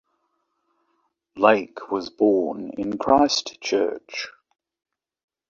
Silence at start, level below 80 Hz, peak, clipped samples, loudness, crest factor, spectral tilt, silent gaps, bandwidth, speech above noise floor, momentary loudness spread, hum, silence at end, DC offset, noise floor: 1.35 s; -60 dBFS; -2 dBFS; under 0.1%; -22 LUFS; 22 dB; -3.5 dB/octave; none; 7.6 kHz; 51 dB; 13 LU; none; 1.2 s; under 0.1%; -73 dBFS